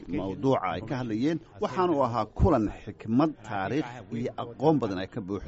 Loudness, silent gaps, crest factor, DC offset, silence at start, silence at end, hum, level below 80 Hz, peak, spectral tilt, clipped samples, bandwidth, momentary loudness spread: -28 LUFS; none; 18 dB; under 0.1%; 0 s; 0 s; none; -42 dBFS; -10 dBFS; -6.5 dB/octave; under 0.1%; 8 kHz; 9 LU